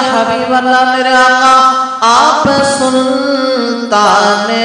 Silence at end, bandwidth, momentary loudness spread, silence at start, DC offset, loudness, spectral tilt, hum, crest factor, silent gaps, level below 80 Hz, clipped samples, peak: 0 s; 11 kHz; 6 LU; 0 s; under 0.1%; -9 LUFS; -3 dB/octave; none; 10 dB; none; -50 dBFS; 0.3%; 0 dBFS